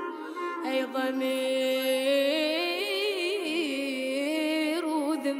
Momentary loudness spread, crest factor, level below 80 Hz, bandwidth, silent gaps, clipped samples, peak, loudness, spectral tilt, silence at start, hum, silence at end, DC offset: 5 LU; 12 dB; under -90 dBFS; 16 kHz; none; under 0.1%; -16 dBFS; -28 LUFS; -1.5 dB/octave; 0 s; none; 0 s; under 0.1%